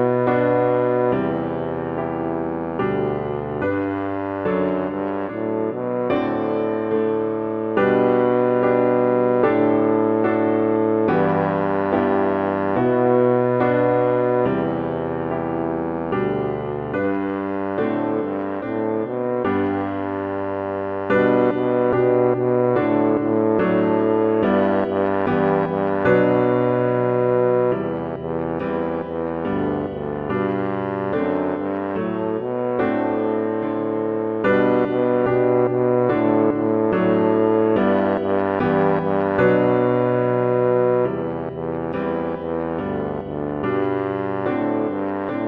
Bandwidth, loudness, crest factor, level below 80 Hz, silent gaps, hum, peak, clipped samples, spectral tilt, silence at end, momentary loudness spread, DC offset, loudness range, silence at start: 4.9 kHz; -20 LUFS; 16 dB; -52 dBFS; none; none; -4 dBFS; under 0.1%; -10.5 dB/octave; 0 s; 8 LU; under 0.1%; 5 LU; 0 s